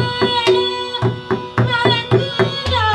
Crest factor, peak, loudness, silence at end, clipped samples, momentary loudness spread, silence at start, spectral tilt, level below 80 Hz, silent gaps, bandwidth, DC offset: 16 dB; 0 dBFS; -17 LUFS; 0 s; under 0.1%; 6 LU; 0 s; -6 dB/octave; -42 dBFS; none; 11 kHz; under 0.1%